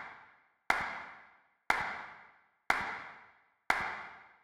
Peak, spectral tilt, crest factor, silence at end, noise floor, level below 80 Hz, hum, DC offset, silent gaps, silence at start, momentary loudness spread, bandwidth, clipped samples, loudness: -12 dBFS; -2 dB/octave; 28 dB; 0.15 s; -64 dBFS; -66 dBFS; none; under 0.1%; none; 0 s; 21 LU; 15.5 kHz; under 0.1%; -35 LUFS